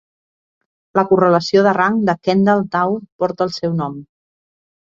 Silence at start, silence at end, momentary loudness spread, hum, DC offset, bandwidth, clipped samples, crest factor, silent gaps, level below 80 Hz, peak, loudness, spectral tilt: 0.95 s; 0.8 s; 9 LU; none; under 0.1%; 7.6 kHz; under 0.1%; 16 dB; 3.12-3.19 s; -58 dBFS; -2 dBFS; -16 LUFS; -7 dB/octave